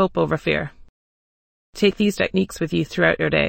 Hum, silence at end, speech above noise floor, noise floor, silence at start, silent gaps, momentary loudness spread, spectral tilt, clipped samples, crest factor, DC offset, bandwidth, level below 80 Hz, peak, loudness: none; 0 s; over 70 dB; under -90 dBFS; 0 s; 0.89-1.73 s; 6 LU; -5.5 dB/octave; under 0.1%; 18 dB; under 0.1%; 16.5 kHz; -46 dBFS; -4 dBFS; -21 LUFS